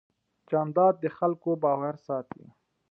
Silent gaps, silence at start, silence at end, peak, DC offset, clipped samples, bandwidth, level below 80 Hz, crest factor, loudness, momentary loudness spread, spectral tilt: none; 0.5 s; 0.7 s; -12 dBFS; under 0.1%; under 0.1%; 4.9 kHz; -78 dBFS; 18 dB; -27 LUFS; 11 LU; -11 dB/octave